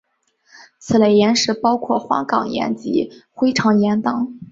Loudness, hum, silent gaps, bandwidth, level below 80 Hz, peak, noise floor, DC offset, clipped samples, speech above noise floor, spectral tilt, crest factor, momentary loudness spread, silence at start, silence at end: -18 LUFS; none; none; 7.8 kHz; -56 dBFS; -2 dBFS; -60 dBFS; under 0.1%; under 0.1%; 42 dB; -5 dB/octave; 16 dB; 8 LU; 0.85 s; 0.05 s